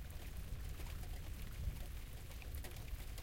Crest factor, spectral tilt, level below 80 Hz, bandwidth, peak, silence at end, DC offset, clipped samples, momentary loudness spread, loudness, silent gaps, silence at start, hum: 14 dB; -4.5 dB/octave; -48 dBFS; 16.5 kHz; -32 dBFS; 0 s; under 0.1%; under 0.1%; 4 LU; -50 LUFS; none; 0 s; none